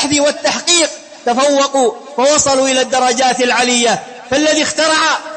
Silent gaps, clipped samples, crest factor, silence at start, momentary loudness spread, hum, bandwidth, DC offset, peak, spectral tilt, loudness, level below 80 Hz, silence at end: none; under 0.1%; 14 dB; 0 s; 6 LU; none; 8.8 kHz; under 0.1%; 0 dBFS; -1.5 dB/octave; -12 LUFS; -52 dBFS; 0 s